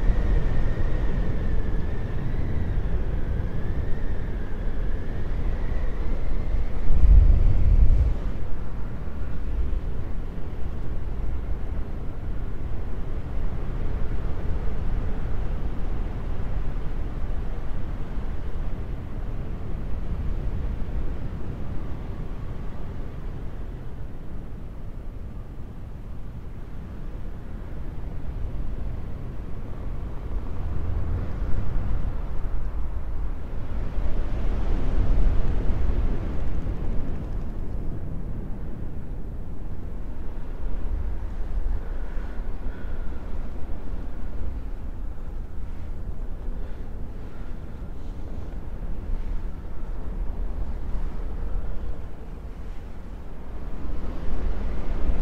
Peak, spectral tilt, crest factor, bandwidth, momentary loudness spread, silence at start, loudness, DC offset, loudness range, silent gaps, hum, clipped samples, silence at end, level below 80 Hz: -4 dBFS; -9 dB/octave; 20 dB; 3.9 kHz; 10 LU; 0 s; -32 LUFS; under 0.1%; 12 LU; none; none; under 0.1%; 0 s; -26 dBFS